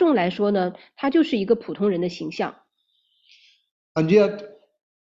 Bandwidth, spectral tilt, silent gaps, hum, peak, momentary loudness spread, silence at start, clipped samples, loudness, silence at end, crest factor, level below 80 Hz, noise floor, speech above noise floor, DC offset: 7.6 kHz; -7.5 dB/octave; 3.71-3.95 s; none; -4 dBFS; 11 LU; 0 s; under 0.1%; -22 LUFS; 0.7 s; 18 dB; -66 dBFS; -70 dBFS; 48 dB; under 0.1%